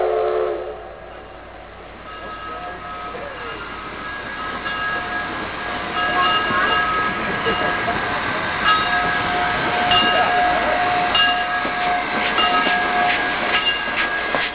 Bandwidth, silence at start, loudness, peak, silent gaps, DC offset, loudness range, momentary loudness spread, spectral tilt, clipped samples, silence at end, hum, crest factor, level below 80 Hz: 4 kHz; 0 s; -19 LUFS; -4 dBFS; none; under 0.1%; 13 LU; 16 LU; -7 dB/octave; under 0.1%; 0 s; none; 16 dB; -44 dBFS